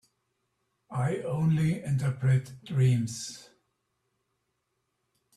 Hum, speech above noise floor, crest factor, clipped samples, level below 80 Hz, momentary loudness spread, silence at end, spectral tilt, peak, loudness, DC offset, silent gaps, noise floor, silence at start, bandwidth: none; 52 dB; 16 dB; under 0.1%; -62 dBFS; 12 LU; 1.95 s; -7 dB/octave; -14 dBFS; -28 LUFS; under 0.1%; none; -79 dBFS; 0.9 s; 12.5 kHz